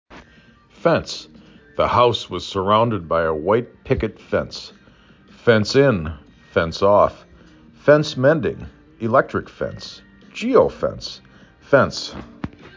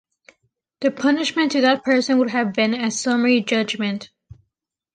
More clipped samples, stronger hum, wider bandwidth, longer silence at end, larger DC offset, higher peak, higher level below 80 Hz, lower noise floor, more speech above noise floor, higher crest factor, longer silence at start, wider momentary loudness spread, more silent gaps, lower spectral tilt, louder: neither; neither; second, 7.6 kHz vs 9.4 kHz; second, 0.1 s vs 0.9 s; neither; about the same, -2 dBFS vs -4 dBFS; first, -44 dBFS vs -62 dBFS; second, -51 dBFS vs -79 dBFS; second, 32 dB vs 60 dB; about the same, 20 dB vs 16 dB; second, 0.1 s vs 0.8 s; first, 18 LU vs 7 LU; neither; first, -6 dB/octave vs -4 dB/octave; about the same, -19 LUFS vs -19 LUFS